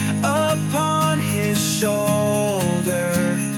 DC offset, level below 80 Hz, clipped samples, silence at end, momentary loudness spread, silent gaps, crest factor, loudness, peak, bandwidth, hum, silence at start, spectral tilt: under 0.1%; -56 dBFS; under 0.1%; 0 s; 2 LU; none; 14 dB; -20 LUFS; -6 dBFS; 17.5 kHz; none; 0 s; -5 dB/octave